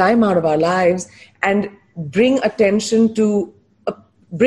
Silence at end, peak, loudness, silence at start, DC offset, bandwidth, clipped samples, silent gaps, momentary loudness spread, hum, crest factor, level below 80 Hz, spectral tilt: 0 s; -4 dBFS; -17 LUFS; 0 s; under 0.1%; 11.5 kHz; under 0.1%; none; 14 LU; none; 14 dB; -54 dBFS; -5.5 dB/octave